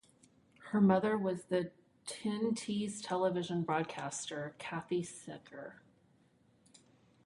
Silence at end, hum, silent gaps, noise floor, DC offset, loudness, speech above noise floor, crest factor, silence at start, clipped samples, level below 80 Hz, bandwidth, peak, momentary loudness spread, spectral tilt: 1.5 s; none; none; -69 dBFS; under 0.1%; -36 LUFS; 34 dB; 22 dB; 0.6 s; under 0.1%; -76 dBFS; 11.5 kHz; -16 dBFS; 19 LU; -5.5 dB/octave